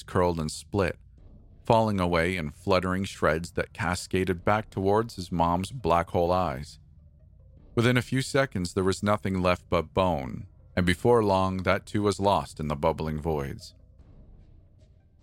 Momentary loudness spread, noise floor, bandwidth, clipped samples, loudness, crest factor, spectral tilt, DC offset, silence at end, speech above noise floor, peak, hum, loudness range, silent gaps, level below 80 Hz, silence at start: 9 LU; -57 dBFS; 16.5 kHz; under 0.1%; -27 LUFS; 22 dB; -6 dB/octave; under 0.1%; 0.85 s; 30 dB; -6 dBFS; none; 2 LU; none; -46 dBFS; 0 s